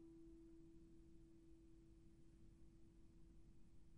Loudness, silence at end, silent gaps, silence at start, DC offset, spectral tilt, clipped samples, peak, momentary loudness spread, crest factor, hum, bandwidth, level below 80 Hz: -68 LUFS; 0 s; none; 0 s; under 0.1%; -7.5 dB/octave; under 0.1%; -54 dBFS; 5 LU; 10 dB; none; 11 kHz; -70 dBFS